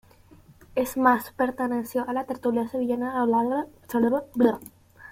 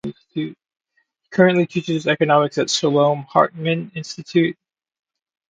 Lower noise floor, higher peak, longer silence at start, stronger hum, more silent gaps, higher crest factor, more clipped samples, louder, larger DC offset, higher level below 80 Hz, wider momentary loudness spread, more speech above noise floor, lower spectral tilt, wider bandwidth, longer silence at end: second, -53 dBFS vs -68 dBFS; second, -6 dBFS vs 0 dBFS; first, 0.75 s vs 0.05 s; neither; neither; about the same, 20 dB vs 20 dB; neither; second, -25 LUFS vs -19 LUFS; neither; about the same, -60 dBFS vs -64 dBFS; second, 8 LU vs 13 LU; second, 28 dB vs 50 dB; about the same, -6 dB/octave vs -5 dB/octave; first, 16.5 kHz vs 9.4 kHz; second, 0 s vs 0.95 s